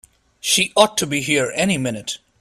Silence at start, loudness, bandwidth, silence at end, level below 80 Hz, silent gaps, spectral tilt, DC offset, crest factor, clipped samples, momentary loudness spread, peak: 0.45 s; -18 LUFS; 15.5 kHz; 0.25 s; -56 dBFS; none; -3 dB/octave; under 0.1%; 20 dB; under 0.1%; 12 LU; 0 dBFS